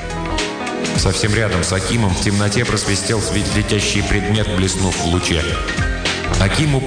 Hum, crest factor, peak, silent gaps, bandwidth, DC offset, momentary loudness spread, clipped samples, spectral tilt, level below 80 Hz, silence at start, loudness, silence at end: none; 14 dB; -4 dBFS; none; 10 kHz; under 0.1%; 4 LU; under 0.1%; -4 dB/octave; -28 dBFS; 0 s; -17 LUFS; 0 s